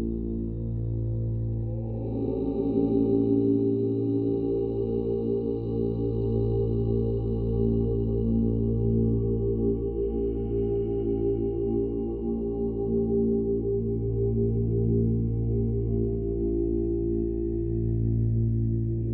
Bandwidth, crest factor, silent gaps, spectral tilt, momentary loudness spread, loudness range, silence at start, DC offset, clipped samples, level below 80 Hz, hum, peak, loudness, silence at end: 4 kHz; 14 dB; none; -13.5 dB/octave; 5 LU; 2 LU; 0 s; under 0.1%; under 0.1%; -36 dBFS; none; -12 dBFS; -27 LUFS; 0 s